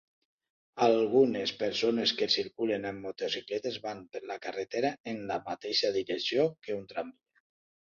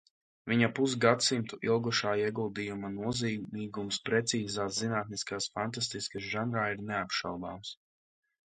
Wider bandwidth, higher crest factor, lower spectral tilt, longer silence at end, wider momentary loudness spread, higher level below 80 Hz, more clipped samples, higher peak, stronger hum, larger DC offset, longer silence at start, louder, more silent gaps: second, 7.2 kHz vs 9.6 kHz; about the same, 20 dB vs 24 dB; about the same, -4 dB/octave vs -4 dB/octave; first, 0.85 s vs 0.7 s; about the same, 13 LU vs 11 LU; second, -72 dBFS vs -66 dBFS; neither; second, -12 dBFS vs -8 dBFS; neither; neither; first, 0.75 s vs 0.45 s; about the same, -31 LUFS vs -32 LUFS; first, 5.00-5.04 s vs none